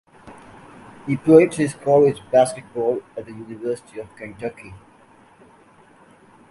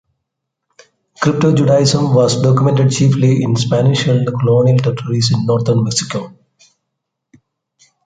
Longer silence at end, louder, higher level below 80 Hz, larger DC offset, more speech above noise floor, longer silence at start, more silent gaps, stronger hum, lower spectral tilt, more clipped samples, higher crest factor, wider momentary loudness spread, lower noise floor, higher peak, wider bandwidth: about the same, 1.75 s vs 1.75 s; second, -19 LUFS vs -13 LUFS; second, -58 dBFS vs -50 dBFS; neither; second, 32 dB vs 64 dB; second, 0.25 s vs 1.2 s; neither; neither; about the same, -6.5 dB/octave vs -6 dB/octave; neither; first, 22 dB vs 12 dB; first, 23 LU vs 6 LU; second, -51 dBFS vs -76 dBFS; about the same, 0 dBFS vs -2 dBFS; first, 11.5 kHz vs 9.4 kHz